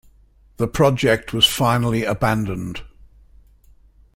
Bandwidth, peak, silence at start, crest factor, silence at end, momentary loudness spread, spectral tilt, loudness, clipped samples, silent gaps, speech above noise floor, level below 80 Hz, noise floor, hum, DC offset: 16.5 kHz; -2 dBFS; 0.6 s; 18 dB; 1.3 s; 13 LU; -4.5 dB/octave; -19 LUFS; under 0.1%; none; 34 dB; -42 dBFS; -52 dBFS; none; under 0.1%